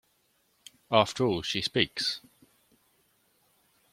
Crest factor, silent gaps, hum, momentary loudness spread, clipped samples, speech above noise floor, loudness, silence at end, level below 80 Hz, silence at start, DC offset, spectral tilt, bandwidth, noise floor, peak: 28 dB; none; none; 6 LU; under 0.1%; 43 dB; -28 LUFS; 1.75 s; -64 dBFS; 0.9 s; under 0.1%; -4 dB/octave; 16.5 kHz; -71 dBFS; -6 dBFS